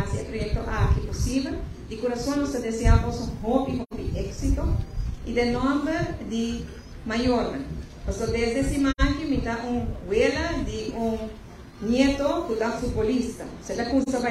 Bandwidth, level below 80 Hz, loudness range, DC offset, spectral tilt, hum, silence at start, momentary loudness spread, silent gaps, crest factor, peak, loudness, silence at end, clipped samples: 14 kHz; -32 dBFS; 1 LU; under 0.1%; -6 dB/octave; none; 0 s; 11 LU; none; 20 dB; -6 dBFS; -26 LUFS; 0 s; under 0.1%